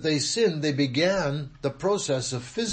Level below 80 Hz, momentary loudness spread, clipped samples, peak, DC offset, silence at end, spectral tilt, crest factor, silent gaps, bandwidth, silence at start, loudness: -54 dBFS; 7 LU; under 0.1%; -12 dBFS; under 0.1%; 0 s; -4.5 dB/octave; 14 dB; none; 8.8 kHz; 0 s; -26 LUFS